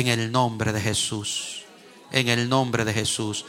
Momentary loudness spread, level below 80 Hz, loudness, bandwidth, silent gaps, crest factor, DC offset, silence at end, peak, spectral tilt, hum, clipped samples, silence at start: 7 LU; -56 dBFS; -24 LUFS; 16.5 kHz; none; 20 dB; under 0.1%; 0 s; -4 dBFS; -4 dB/octave; none; under 0.1%; 0 s